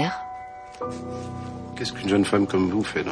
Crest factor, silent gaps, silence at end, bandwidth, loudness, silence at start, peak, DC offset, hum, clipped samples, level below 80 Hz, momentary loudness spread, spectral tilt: 18 dB; none; 0 s; 10.5 kHz; -26 LUFS; 0 s; -8 dBFS; under 0.1%; none; under 0.1%; -54 dBFS; 15 LU; -5.5 dB/octave